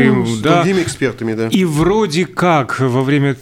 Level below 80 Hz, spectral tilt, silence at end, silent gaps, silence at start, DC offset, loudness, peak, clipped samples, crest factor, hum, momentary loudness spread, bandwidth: -42 dBFS; -6 dB/octave; 0 s; none; 0 s; under 0.1%; -15 LUFS; 0 dBFS; under 0.1%; 14 dB; none; 5 LU; 16 kHz